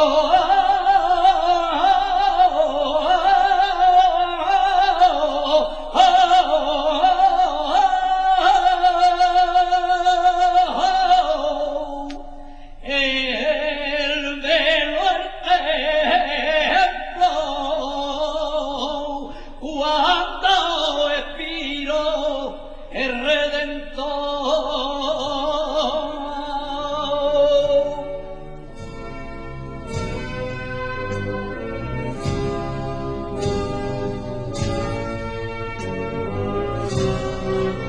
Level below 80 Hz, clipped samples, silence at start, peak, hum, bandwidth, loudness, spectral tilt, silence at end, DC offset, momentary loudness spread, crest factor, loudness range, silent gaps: -36 dBFS; under 0.1%; 0 s; -2 dBFS; none; 9.6 kHz; -19 LUFS; -4.5 dB/octave; 0 s; under 0.1%; 13 LU; 16 dB; 9 LU; none